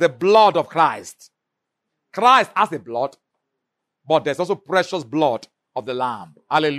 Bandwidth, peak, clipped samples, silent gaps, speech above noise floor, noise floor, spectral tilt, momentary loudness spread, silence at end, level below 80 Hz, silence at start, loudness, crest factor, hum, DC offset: 13.5 kHz; 0 dBFS; under 0.1%; none; 62 dB; -80 dBFS; -4.5 dB/octave; 17 LU; 0 s; -72 dBFS; 0 s; -19 LUFS; 20 dB; none; under 0.1%